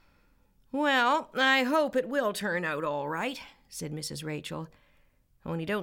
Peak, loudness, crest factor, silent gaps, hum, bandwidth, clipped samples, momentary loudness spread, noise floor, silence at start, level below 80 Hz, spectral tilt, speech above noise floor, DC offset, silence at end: -12 dBFS; -29 LUFS; 18 dB; none; none; 17 kHz; under 0.1%; 17 LU; -65 dBFS; 0.75 s; -66 dBFS; -4 dB/octave; 36 dB; under 0.1%; 0 s